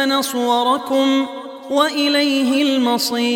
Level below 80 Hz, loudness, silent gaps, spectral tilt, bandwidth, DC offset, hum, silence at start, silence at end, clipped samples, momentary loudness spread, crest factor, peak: -70 dBFS; -17 LUFS; none; -2 dB/octave; 18 kHz; under 0.1%; none; 0 s; 0 s; under 0.1%; 5 LU; 16 dB; -2 dBFS